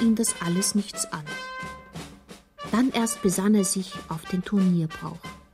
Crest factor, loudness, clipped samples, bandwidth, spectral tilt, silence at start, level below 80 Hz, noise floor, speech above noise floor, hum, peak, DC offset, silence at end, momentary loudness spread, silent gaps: 14 dB; -25 LUFS; under 0.1%; 16 kHz; -4.5 dB/octave; 0 s; -54 dBFS; -48 dBFS; 23 dB; none; -12 dBFS; under 0.1%; 0.15 s; 18 LU; none